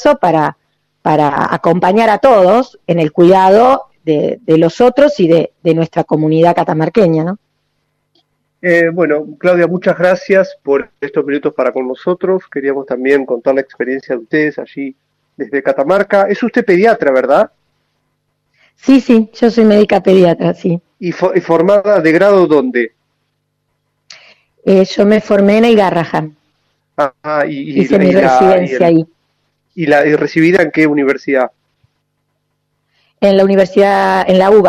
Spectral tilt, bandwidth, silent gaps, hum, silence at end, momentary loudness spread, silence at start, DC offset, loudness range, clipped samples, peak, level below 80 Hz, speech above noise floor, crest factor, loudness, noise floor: -7 dB/octave; 12 kHz; none; none; 0 s; 10 LU; 0 s; under 0.1%; 5 LU; under 0.1%; 0 dBFS; -52 dBFS; 56 dB; 12 dB; -11 LUFS; -66 dBFS